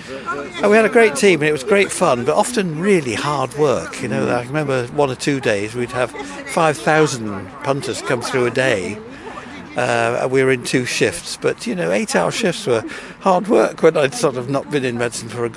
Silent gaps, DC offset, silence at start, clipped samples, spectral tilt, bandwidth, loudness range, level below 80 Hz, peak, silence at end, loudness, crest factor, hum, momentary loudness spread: none; under 0.1%; 0 s; under 0.1%; -4.5 dB/octave; 12 kHz; 4 LU; -52 dBFS; 0 dBFS; 0 s; -18 LUFS; 16 dB; none; 10 LU